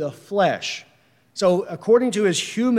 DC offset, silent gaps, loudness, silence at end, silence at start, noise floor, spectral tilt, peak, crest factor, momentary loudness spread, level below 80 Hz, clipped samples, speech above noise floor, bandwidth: under 0.1%; none; -21 LUFS; 0 s; 0 s; -56 dBFS; -4.5 dB/octave; -6 dBFS; 16 dB; 11 LU; -70 dBFS; under 0.1%; 36 dB; 15 kHz